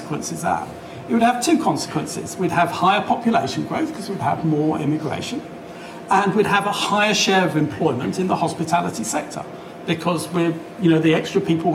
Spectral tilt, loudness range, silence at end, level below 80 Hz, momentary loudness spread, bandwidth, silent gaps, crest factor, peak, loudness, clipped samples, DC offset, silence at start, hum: -5 dB/octave; 3 LU; 0 s; -58 dBFS; 11 LU; 16 kHz; none; 14 dB; -6 dBFS; -20 LUFS; under 0.1%; under 0.1%; 0 s; none